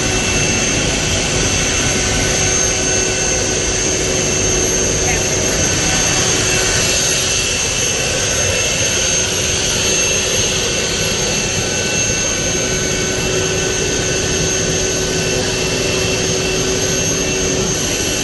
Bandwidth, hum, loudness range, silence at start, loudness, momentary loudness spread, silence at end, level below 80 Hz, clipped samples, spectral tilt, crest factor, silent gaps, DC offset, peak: 12.5 kHz; none; 2 LU; 0 s; -14 LUFS; 3 LU; 0 s; -30 dBFS; under 0.1%; -2 dB/octave; 14 dB; none; under 0.1%; -2 dBFS